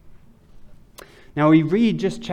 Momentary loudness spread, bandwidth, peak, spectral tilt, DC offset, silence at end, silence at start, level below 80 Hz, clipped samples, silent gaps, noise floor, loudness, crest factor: 10 LU; 9.8 kHz; -4 dBFS; -7.5 dB/octave; under 0.1%; 0 s; 0.05 s; -52 dBFS; under 0.1%; none; -45 dBFS; -18 LUFS; 16 dB